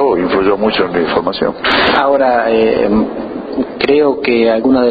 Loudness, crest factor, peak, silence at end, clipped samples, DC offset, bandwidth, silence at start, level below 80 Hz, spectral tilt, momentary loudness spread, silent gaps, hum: -12 LUFS; 12 dB; 0 dBFS; 0 s; under 0.1%; under 0.1%; 5 kHz; 0 s; -40 dBFS; -7.5 dB/octave; 7 LU; none; none